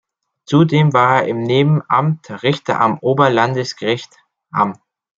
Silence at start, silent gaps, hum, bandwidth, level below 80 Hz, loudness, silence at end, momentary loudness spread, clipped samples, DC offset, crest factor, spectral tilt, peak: 0.5 s; none; none; 7.6 kHz; -58 dBFS; -16 LUFS; 0.45 s; 8 LU; under 0.1%; under 0.1%; 14 dB; -7 dB/octave; -2 dBFS